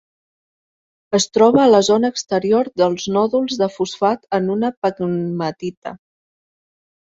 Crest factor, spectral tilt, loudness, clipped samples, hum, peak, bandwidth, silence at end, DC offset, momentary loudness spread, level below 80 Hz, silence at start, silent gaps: 16 dB; -5 dB/octave; -17 LUFS; under 0.1%; none; -2 dBFS; 8 kHz; 1.05 s; under 0.1%; 11 LU; -58 dBFS; 1.1 s; 4.77-4.82 s, 5.77-5.82 s